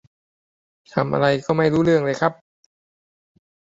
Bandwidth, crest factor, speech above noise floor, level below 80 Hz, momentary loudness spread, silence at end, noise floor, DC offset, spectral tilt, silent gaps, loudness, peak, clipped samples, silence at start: 7.8 kHz; 20 dB; over 71 dB; -56 dBFS; 7 LU; 1.45 s; under -90 dBFS; under 0.1%; -7 dB/octave; none; -20 LUFS; -2 dBFS; under 0.1%; 0.95 s